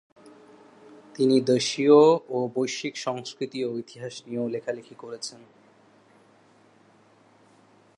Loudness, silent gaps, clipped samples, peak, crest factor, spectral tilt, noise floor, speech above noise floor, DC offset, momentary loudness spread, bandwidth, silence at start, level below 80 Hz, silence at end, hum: -24 LUFS; none; under 0.1%; -6 dBFS; 22 dB; -5 dB/octave; -58 dBFS; 34 dB; under 0.1%; 20 LU; 11 kHz; 1.2 s; -80 dBFS; 2.6 s; none